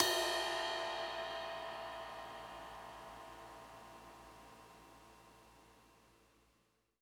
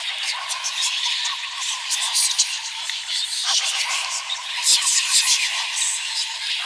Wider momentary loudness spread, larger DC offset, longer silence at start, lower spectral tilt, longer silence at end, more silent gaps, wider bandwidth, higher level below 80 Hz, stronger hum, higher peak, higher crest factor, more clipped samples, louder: first, 24 LU vs 9 LU; neither; about the same, 0 s vs 0 s; first, -1.5 dB/octave vs 5.5 dB/octave; first, 0.95 s vs 0 s; neither; first, over 20 kHz vs 11 kHz; about the same, -70 dBFS vs -74 dBFS; neither; second, -12 dBFS vs -4 dBFS; first, 32 dB vs 18 dB; neither; second, -42 LUFS vs -20 LUFS